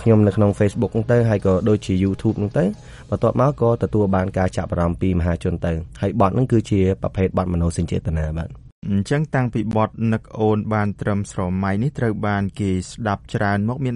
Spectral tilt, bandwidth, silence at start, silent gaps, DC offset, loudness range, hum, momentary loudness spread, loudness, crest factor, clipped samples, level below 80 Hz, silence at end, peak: -8 dB/octave; 11.5 kHz; 0 s; 8.72-8.82 s; under 0.1%; 3 LU; none; 6 LU; -20 LUFS; 16 dB; under 0.1%; -38 dBFS; 0 s; -2 dBFS